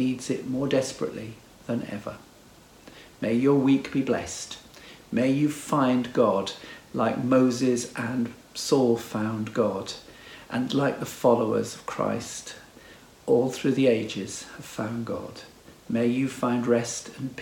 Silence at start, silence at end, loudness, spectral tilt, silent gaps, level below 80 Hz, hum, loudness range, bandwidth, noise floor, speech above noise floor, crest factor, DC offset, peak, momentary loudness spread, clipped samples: 0 s; 0 s; -26 LUFS; -5.5 dB/octave; none; -62 dBFS; none; 3 LU; 17.5 kHz; -52 dBFS; 27 dB; 20 dB; under 0.1%; -6 dBFS; 17 LU; under 0.1%